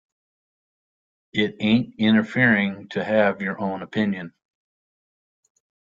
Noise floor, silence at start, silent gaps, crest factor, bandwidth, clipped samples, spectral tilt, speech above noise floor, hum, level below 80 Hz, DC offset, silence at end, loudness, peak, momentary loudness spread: under -90 dBFS; 1.35 s; none; 20 dB; 7.2 kHz; under 0.1%; -7.5 dB/octave; over 69 dB; none; -62 dBFS; under 0.1%; 1.7 s; -22 LUFS; -4 dBFS; 11 LU